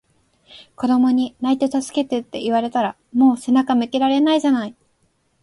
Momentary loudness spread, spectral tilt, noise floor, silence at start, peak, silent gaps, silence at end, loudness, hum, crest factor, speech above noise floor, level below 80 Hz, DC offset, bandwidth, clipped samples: 7 LU; -4.5 dB/octave; -64 dBFS; 0.55 s; -6 dBFS; none; 0.7 s; -19 LUFS; none; 14 dB; 46 dB; -62 dBFS; under 0.1%; 11.5 kHz; under 0.1%